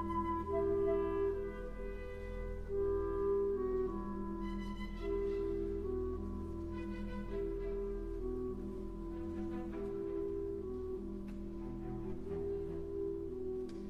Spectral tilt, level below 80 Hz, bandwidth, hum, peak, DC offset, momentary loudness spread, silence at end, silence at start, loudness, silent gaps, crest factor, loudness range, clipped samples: -9 dB/octave; -48 dBFS; 6.4 kHz; none; -24 dBFS; under 0.1%; 10 LU; 0 s; 0 s; -40 LUFS; none; 14 dB; 5 LU; under 0.1%